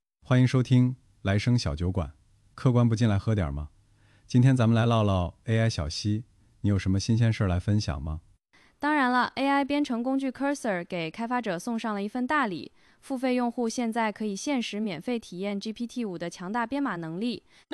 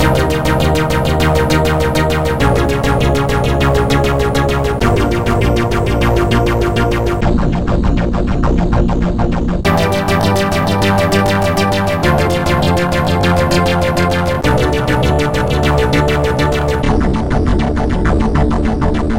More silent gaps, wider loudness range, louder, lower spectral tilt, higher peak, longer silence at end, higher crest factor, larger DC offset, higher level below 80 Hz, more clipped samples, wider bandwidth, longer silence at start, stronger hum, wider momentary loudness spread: neither; first, 5 LU vs 1 LU; second, -27 LUFS vs -14 LUFS; about the same, -6.5 dB/octave vs -6 dB/octave; second, -10 dBFS vs 0 dBFS; first, 0.35 s vs 0 s; first, 18 dB vs 12 dB; second, under 0.1% vs 3%; second, -48 dBFS vs -20 dBFS; neither; second, 11.5 kHz vs 17 kHz; first, 0.3 s vs 0 s; neither; first, 10 LU vs 3 LU